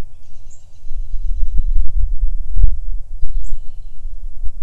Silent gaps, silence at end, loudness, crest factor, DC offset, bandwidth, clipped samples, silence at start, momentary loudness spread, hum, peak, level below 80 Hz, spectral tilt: none; 0 s; -26 LUFS; 10 dB; under 0.1%; 0.3 kHz; 1%; 0 s; 21 LU; none; 0 dBFS; -18 dBFS; -7.5 dB/octave